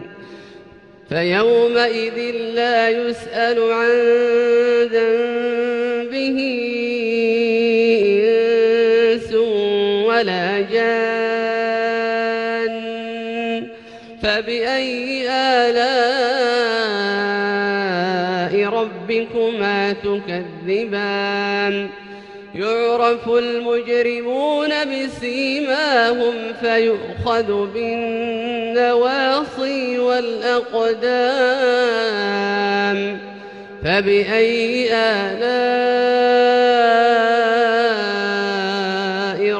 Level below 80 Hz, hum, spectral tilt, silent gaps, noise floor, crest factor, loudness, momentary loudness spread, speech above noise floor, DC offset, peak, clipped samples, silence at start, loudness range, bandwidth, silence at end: -54 dBFS; none; -5 dB/octave; none; -43 dBFS; 14 dB; -18 LUFS; 8 LU; 26 dB; under 0.1%; -4 dBFS; under 0.1%; 0 s; 5 LU; 9.2 kHz; 0 s